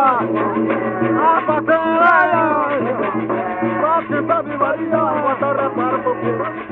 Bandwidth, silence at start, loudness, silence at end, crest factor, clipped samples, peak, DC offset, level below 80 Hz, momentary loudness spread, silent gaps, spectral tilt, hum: 4.4 kHz; 0 s; -17 LUFS; 0 s; 16 dB; under 0.1%; 0 dBFS; under 0.1%; -58 dBFS; 7 LU; none; -9 dB/octave; none